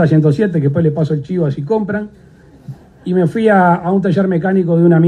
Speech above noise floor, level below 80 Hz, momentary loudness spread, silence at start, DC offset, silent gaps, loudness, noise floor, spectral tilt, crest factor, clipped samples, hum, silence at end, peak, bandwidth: 21 dB; -50 dBFS; 16 LU; 0 s; under 0.1%; none; -14 LUFS; -34 dBFS; -9.5 dB/octave; 12 dB; under 0.1%; none; 0 s; 0 dBFS; 9.2 kHz